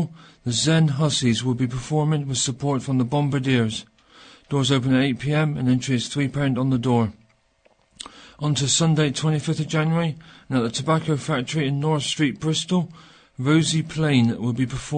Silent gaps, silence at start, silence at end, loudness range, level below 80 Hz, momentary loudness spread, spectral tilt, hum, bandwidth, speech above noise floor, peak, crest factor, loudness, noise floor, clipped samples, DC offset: none; 0 s; 0 s; 2 LU; -54 dBFS; 8 LU; -5 dB/octave; none; 9.6 kHz; 40 dB; -6 dBFS; 16 dB; -22 LUFS; -61 dBFS; under 0.1%; under 0.1%